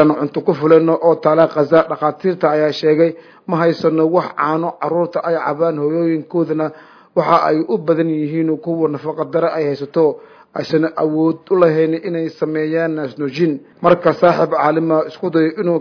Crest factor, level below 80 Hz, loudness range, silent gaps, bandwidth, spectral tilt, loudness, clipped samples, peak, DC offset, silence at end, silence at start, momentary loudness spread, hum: 16 dB; -62 dBFS; 4 LU; none; 5.4 kHz; -8.5 dB/octave; -16 LUFS; under 0.1%; 0 dBFS; under 0.1%; 0 s; 0 s; 7 LU; none